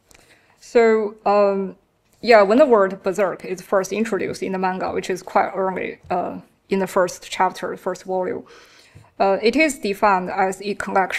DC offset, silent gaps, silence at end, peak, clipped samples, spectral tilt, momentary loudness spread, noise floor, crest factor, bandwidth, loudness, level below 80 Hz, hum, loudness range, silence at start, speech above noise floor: under 0.1%; none; 0 s; 0 dBFS; under 0.1%; -5 dB/octave; 12 LU; -53 dBFS; 20 dB; 14.5 kHz; -20 LUFS; -58 dBFS; none; 6 LU; 0.65 s; 34 dB